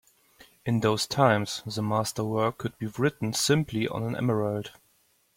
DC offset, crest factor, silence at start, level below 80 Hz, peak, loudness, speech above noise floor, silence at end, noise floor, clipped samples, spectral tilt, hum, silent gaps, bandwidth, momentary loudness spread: under 0.1%; 22 dB; 0.65 s; -60 dBFS; -6 dBFS; -27 LUFS; 40 dB; 0.65 s; -67 dBFS; under 0.1%; -5 dB/octave; none; none; 16.5 kHz; 10 LU